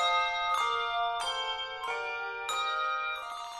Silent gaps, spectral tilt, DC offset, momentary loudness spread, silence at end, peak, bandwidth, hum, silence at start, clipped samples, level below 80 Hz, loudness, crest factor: none; 1 dB/octave; under 0.1%; 6 LU; 0 s; -16 dBFS; 13.5 kHz; none; 0 s; under 0.1%; -64 dBFS; -31 LUFS; 16 dB